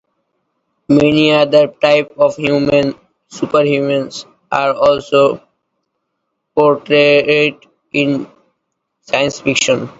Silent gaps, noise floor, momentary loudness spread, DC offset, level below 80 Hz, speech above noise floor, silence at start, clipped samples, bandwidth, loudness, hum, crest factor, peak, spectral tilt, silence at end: none; -72 dBFS; 11 LU; under 0.1%; -52 dBFS; 59 dB; 0.9 s; under 0.1%; 8 kHz; -13 LUFS; none; 14 dB; 0 dBFS; -4.5 dB/octave; 0.1 s